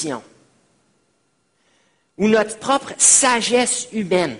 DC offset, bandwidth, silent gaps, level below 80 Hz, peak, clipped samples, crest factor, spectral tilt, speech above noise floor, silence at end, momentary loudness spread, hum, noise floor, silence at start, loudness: under 0.1%; 11 kHz; none; -60 dBFS; 0 dBFS; under 0.1%; 20 dB; -2 dB/octave; 48 dB; 0 s; 11 LU; none; -66 dBFS; 0 s; -16 LUFS